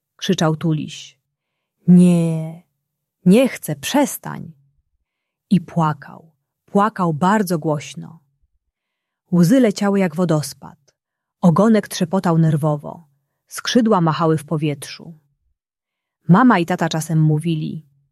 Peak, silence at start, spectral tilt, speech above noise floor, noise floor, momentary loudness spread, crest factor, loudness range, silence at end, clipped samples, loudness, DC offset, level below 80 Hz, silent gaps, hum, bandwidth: -2 dBFS; 0.2 s; -6.5 dB/octave; 68 dB; -84 dBFS; 18 LU; 16 dB; 4 LU; 0.3 s; under 0.1%; -17 LUFS; under 0.1%; -62 dBFS; none; none; 14 kHz